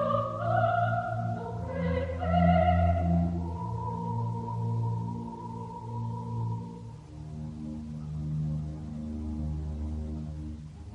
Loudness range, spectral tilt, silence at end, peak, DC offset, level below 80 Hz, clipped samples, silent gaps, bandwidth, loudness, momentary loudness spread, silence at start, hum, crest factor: 9 LU; -9 dB/octave; 0 s; -12 dBFS; under 0.1%; -46 dBFS; under 0.1%; none; 8.2 kHz; -31 LUFS; 14 LU; 0 s; none; 18 dB